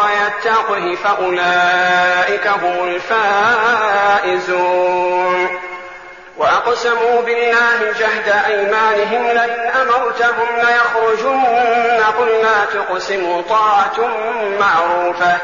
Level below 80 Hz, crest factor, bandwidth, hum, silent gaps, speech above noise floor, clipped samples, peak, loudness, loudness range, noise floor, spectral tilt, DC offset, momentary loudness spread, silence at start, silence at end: -56 dBFS; 10 dB; 7.4 kHz; none; none; 21 dB; under 0.1%; -4 dBFS; -14 LUFS; 2 LU; -35 dBFS; -0.5 dB/octave; 0.3%; 6 LU; 0 s; 0 s